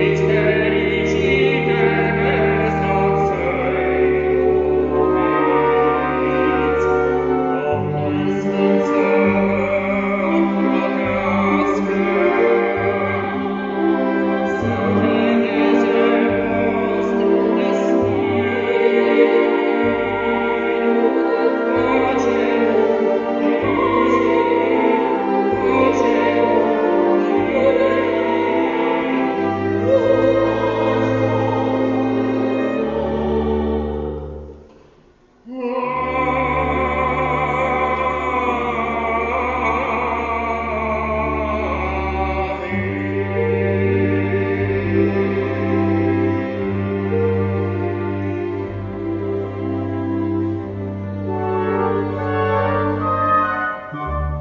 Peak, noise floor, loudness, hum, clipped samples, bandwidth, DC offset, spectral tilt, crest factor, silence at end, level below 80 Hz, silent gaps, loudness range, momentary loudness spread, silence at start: 0 dBFS; -51 dBFS; -18 LUFS; none; under 0.1%; 7.4 kHz; under 0.1%; -7.5 dB/octave; 18 dB; 0 s; -38 dBFS; none; 5 LU; 7 LU; 0 s